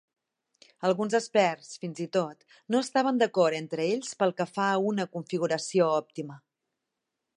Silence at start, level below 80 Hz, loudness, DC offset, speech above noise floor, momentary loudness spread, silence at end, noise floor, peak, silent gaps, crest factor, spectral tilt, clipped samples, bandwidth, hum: 0.8 s; -82 dBFS; -28 LUFS; under 0.1%; 57 dB; 12 LU; 1 s; -85 dBFS; -10 dBFS; none; 18 dB; -5 dB/octave; under 0.1%; 11.5 kHz; none